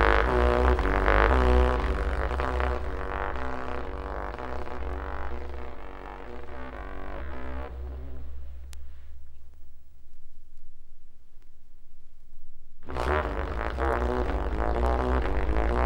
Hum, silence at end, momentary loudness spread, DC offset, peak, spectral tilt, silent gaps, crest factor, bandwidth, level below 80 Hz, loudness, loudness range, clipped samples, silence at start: none; 0 s; 19 LU; under 0.1%; -2 dBFS; -7.5 dB/octave; none; 26 dB; 9 kHz; -32 dBFS; -29 LUFS; 18 LU; under 0.1%; 0 s